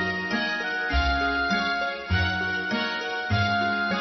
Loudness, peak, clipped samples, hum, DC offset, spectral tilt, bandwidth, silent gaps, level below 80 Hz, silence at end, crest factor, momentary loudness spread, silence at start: -25 LUFS; -12 dBFS; under 0.1%; none; under 0.1%; -5.5 dB/octave; 6.2 kHz; none; -38 dBFS; 0 s; 14 dB; 3 LU; 0 s